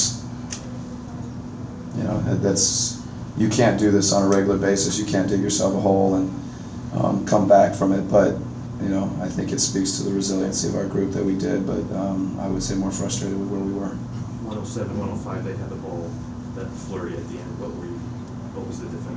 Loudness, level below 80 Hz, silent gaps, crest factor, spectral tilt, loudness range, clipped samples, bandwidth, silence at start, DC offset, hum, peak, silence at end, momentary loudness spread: -23 LUFS; -44 dBFS; none; 20 dB; -5 dB/octave; 10 LU; under 0.1%; 8 kHz; 0 s; under 0.1%; none; -4 dBFS; 0 s; 15 LU